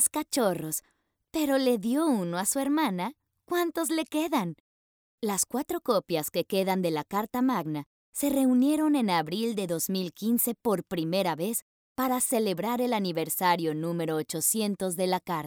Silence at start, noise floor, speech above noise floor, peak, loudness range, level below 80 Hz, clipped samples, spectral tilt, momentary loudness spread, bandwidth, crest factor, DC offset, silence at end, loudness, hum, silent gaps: 0 s; under -90 dBFS; over 62 dB; -12 dBFS; 3 LU; -68 dBFS; under 0.1%; -4 dB/octave; 7 LU; over 20 kHz; 16 dB; under 0.1%; 0 s; -28 LUFS; none; 4.60-5.18 s, 7.86-8.13 s, 11.62-11.95 s